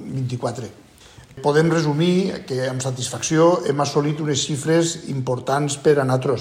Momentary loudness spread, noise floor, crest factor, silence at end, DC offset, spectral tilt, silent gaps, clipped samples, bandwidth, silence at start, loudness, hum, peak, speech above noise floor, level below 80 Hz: 9 LU; -46 dBFS; 16 dB; 0 s; under 0.1%; -5 dB/octave; none; under 0.1%; 15 kHz; 0 s; -20 LUFS; none; -4 dBFS; 26 dB; -56 dBFS